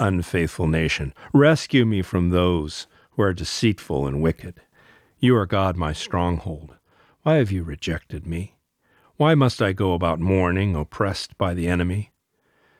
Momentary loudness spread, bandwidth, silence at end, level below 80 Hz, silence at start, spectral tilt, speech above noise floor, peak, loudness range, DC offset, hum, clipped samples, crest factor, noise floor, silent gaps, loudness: 13 LU; 14.5 kHz; 0.75 s; -40 dBFS; 0 s; -6.5 dB/octave; 45 dB; -4 dBFS; 4 LU; under 0.1%; none; under 0.1%; 18 dB; -67 dBFS; none; -22 LUFS